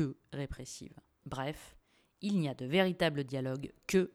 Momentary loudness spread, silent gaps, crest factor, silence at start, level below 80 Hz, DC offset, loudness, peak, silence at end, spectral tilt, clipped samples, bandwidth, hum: 17 LU; none; 20 dB; 0 s; -58 dBFS; under 0.1%; -35 LUFS; -14 dBFS; 0.05 s; -5.5 dB/octave; under 0.1%; 15 kHz; none